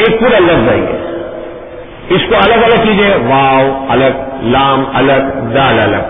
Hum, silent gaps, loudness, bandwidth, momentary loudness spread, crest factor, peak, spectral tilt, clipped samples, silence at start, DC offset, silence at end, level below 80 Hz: none; none; -9 LUFS; 4.4 kHz; 14 LU; 10 dB; 0 dBFS; -9.5 dB/octave; under 0.1%; 0 s; under 0.1%; 0 s; -32 dBFS